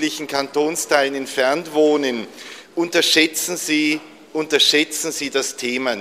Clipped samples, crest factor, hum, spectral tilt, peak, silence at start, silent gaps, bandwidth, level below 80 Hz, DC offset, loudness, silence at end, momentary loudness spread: under 0.1%; 20 dB; none; -1.5 dB/octave; 0 dBFS; 0 s; none; 15.5 kHz; -66 dBFS; under 0.1%; -18 LUFS; 0 s; 12 LU